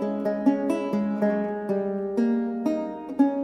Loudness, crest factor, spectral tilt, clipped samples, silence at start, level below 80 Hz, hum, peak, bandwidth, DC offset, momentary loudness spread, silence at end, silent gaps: -26 LUFS; 16 dB; -8.5 dB/octave; under 0.1%; 0 s; -64 dBFS; none; -8 dBFS; 10.5 kHz; under 0.1%; 4 LU; 0 s; none